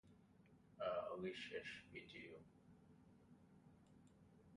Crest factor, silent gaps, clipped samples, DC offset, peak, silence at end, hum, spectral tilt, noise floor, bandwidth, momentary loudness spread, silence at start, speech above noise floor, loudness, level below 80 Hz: 20 dB; none; under 0.1%; under 0.1%; -34 dBFS; 0 s; none; -5 dB/octave; -71 dBFS; 11 kHz; 23 LU; 0.05 s; 17 dB; -50 LUFS; -80 dBFS